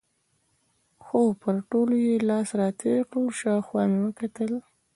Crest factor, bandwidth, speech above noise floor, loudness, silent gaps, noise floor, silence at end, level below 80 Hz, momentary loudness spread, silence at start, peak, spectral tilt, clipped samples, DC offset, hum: 16 dB; 11.5 kHz; 47 dB; -26 LUFS; none; -71 dBFS; 0.35 s; -70 dBFS; 7 LU; 1.05 s; -10 dBFS; -7 dB/octave; under 0.1%; under 0.1%; none